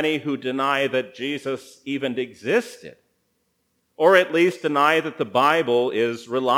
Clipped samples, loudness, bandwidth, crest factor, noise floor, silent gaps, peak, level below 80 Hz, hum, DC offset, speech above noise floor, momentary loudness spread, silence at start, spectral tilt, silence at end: under 0.1%; -21 LUFS; over 20 kHz; 20 dB; -71 dBFS; none; -2 dBFS; -76 dBFS; none; under 0.1%; 49 dB; 12 LU; 0 s; -5 dB/octave; 0 s